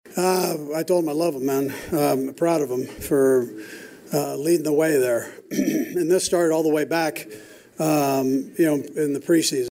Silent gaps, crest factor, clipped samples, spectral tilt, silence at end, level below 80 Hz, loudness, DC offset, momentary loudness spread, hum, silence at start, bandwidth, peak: none; 12 dB; under 0.1%; -5 dB/octave; 0 s; -58 dBFS; -22 LUFS; under 0.1%; 8 LU; none; 0.05 s; 16 kHz; -8 dBFS